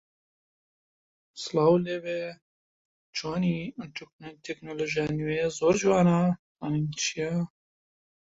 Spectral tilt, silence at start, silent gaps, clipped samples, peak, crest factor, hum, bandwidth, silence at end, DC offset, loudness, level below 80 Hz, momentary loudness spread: -5.5 dB/octave; 1.35 s; 2.42-3.13 s, 4.13-4.19 s, 6.39-6.55 s; under 0.1%; -10 dBFS; 18 dB; none; 8 kHz; 0.8 s; under 0.1%; -27 LUFS; -62 dBFS; 17 LU